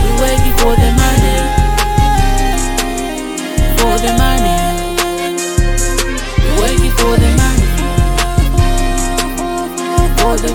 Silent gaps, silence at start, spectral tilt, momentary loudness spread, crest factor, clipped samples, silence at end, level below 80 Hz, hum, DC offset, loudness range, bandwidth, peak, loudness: none; 0 s; -4.5 dB/octave; 6 LU; 12 dB; under 0.1%; 0 s; -14 dBFS; none; under 0.1%; 1 LU; 19.5 kHz; 0 dBFS; -14 LUFS